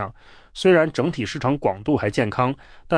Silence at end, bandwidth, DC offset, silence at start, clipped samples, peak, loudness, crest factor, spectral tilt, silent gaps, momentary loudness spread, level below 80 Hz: 0 s; 10.5 kHz; under 0.1%; 0 s; under 0.1%; -6 dBFS; -21 LUFS; 16 dB; -6.5 dB/octave; none; 13 LU; -48 dBFS